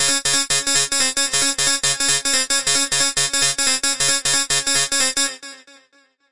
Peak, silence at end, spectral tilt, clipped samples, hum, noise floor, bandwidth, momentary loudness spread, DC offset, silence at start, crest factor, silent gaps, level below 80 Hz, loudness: -4 dBFS; 0 s; 0.5 dB/octave; under 0.1%; none; -58 dBFS; 11.5 kHz; 1 LU; 1%; 0 s; 16 dB; none; -50 dBFS; -16 LUFS